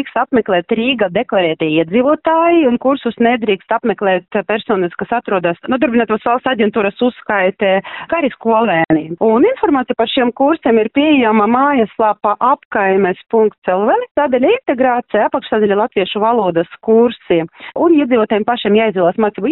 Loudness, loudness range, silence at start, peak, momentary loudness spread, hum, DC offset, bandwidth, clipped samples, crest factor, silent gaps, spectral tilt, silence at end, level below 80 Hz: -14 LUFS; 3 LU; 0 s; -2 dBFS; 5 LU; none; under 0.1%; 4.1 kHz; under 0.1%; 12 dB; 12.65-12.71 s, 13.58-13.62 s, 14.11-14.15 s; -3.5 dB/octave; 0 s; -52 dBFS